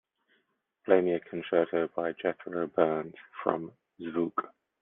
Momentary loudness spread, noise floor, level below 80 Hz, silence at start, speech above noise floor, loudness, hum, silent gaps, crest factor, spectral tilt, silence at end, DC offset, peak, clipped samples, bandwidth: 17 LU; -75 dBFS; -78 dBFS; 0.85 s; 45 dB; -30 LUFS; none; none; 24 dB; -9.5 dB/octave; 0.35 s; under 0.1%; -8 dBFS; under 0.1%; 3.9 kHz